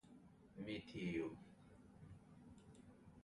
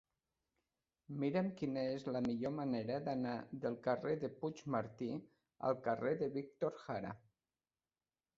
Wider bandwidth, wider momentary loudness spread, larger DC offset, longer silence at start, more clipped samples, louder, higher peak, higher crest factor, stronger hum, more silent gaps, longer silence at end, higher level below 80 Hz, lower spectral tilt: first, 11 kHz vs 7.6 kHz; first, 20 LU vs 7 LU; neither; second, 0.05 s vs 1.1 s; neither; second, -49 LUFS vs -41 LUFS; second, -32 dBFS vs -22 dBFS; about the same, 20 dB vs 20 dB; neither; neither; second, 0 s vs 1.2 s; about the same, -74 dBFS vs -76 dBFS; about the same, -6.5 dB/octave vs -6.5 dB/octave